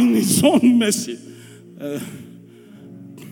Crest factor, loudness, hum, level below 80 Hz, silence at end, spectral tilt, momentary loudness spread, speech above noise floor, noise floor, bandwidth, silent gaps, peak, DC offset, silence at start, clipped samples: 18 dB; -17 LUFS; none; -66 dBFS; 0 s; -4.5 dB/octave; 25 LU; 25 dB; -43 dBFS; 19.5 kHz; none; -2 dBFS; under 0.1%; 0 s; under 0.1%